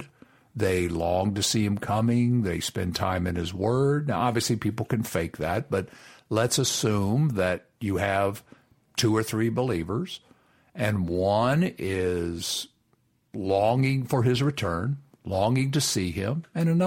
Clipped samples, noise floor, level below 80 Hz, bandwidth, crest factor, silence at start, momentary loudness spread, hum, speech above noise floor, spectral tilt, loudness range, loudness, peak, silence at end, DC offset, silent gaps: under 0.1%; -68 dBFS; -52 dBFS; 16.5 kHz; 16 dB; 0 s; 8 LU; none; 43 dB; -5 dB/octave; 2 LU; -26 LUFS; -10 dBFS; 0 s; under 0.1%; none